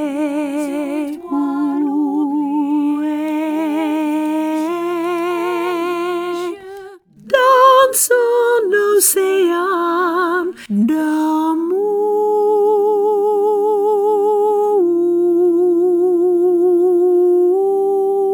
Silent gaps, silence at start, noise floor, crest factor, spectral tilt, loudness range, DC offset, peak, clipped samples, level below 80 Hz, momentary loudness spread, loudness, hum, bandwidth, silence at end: none; 0 s; -37 dBFS; 14 dB; -3.5 dB/octave; 6 LU; under 0.1%; 0 dBFS; under 0.1%; -66 dBFS; 8 LU; -15 LUFS; none; over 20 kHz; 0 s